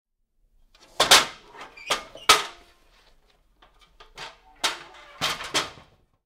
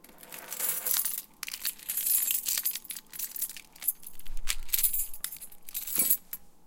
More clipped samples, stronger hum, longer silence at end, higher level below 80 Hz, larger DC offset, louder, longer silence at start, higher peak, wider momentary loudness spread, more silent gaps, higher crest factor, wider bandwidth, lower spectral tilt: neither; neither; first, 0.55 s vs 0 s; second, -56 dBFS vs -46 dBFS; neither; first, -21 LUFS vs -29 LUFS; first, 1 s vs 0.1 s; first, -2 dBFS vs -8 dBFS; first, 25 LU vs 17 LU; neither; about the same, 26 dB vs 24 dB; about the same, 16.5 kHz vs 17.5 kHz; about the same, 0.5 dB/octave vs 1 dB/octave